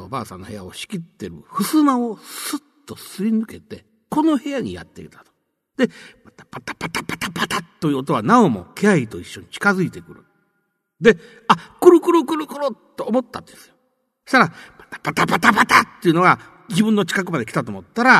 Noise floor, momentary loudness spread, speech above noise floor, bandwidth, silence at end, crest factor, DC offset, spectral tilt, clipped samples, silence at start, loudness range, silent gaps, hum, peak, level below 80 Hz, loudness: -71 dBFS; 20 LU; 52 dB; 13.5 kHz; 0 s; 20 dB; under 0.1%; -5 dB/octave; under 0.1%; 0 s; 8 LU; none; none; 0 dBFS; -58 dBFS; -19 LUFS